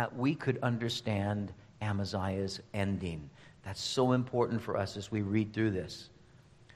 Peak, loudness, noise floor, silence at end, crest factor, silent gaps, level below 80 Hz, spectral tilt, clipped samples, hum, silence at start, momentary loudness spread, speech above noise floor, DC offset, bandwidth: -16 dBFS; -34 LUFS; -59 dBFS; 0.1 s; 18 dB; none; -62 dBFS; -6 dB/octave; under 0.1%; none; 0 s; 14 LU; 26 dB; under 0.1%; 13 kHz